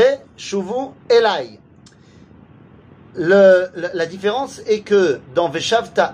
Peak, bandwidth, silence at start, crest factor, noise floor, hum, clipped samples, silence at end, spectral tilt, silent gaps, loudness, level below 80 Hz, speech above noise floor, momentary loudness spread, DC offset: -2 dBFS; 10 kHz; 0 s; 16 dB; -46 dBFS; none; under 0.1%; 0 s; -4.5 dB/octave; none; -17 LUFS; -60 dBFS; 30 dB; 13 LU; under 0.1%